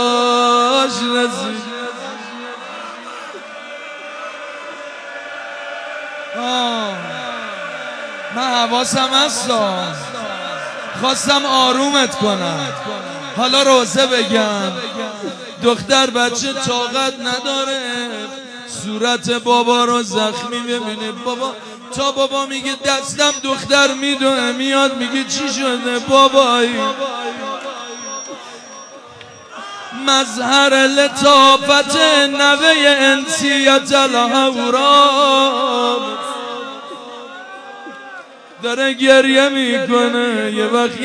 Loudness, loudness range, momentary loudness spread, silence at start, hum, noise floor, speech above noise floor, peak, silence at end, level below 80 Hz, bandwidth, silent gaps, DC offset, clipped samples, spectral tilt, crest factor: -14 LUFS; 12 LU; 19 LU; 0 s; none; -38 dBFS; 23 dB; 0 dBFS; 0 s; -62 dBFS; 11 kHz; none; under 0.1%; under 0.1%; -2 dB/octave; 16 dB